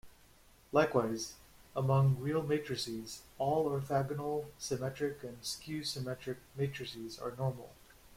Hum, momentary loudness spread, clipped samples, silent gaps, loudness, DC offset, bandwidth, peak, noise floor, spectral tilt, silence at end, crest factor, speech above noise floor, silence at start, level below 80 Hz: none; 13 LU; under 0.1%; none; -36 LUFS; under 0.1%; 16.5 kHz; -14 dBFS; -62 dBFS; -5.5 dB/octave; 0 s; 22 dB; 27 dB; 0.05 s; -64 dBFS